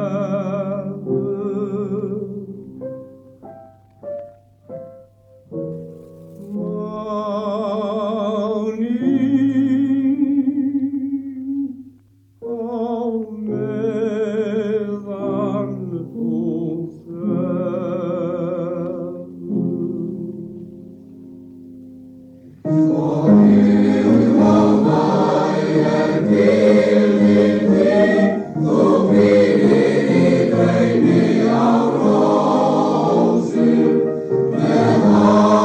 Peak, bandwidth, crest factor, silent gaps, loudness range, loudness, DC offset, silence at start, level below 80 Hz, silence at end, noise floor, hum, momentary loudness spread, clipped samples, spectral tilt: 0 dBFS; 8.6 kHz; 16 dB; none; 14 LU; -17 LUFS; under 0.1%; 0 s; -56 dBFS; 0 s; -51 dBFS; none; 17 LU; under 0.1%; -8 dB/octave